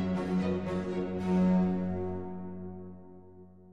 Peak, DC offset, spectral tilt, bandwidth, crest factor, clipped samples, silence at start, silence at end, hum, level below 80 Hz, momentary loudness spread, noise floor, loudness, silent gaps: -18 dBFS; under 0.1%; -9 dB/octave; 7.2 kHz; 14 dB; under 0.1%; 0 s; 0 s; none; -56 dBFS; 18 LU; -53 dBFS; -31 LUFS; none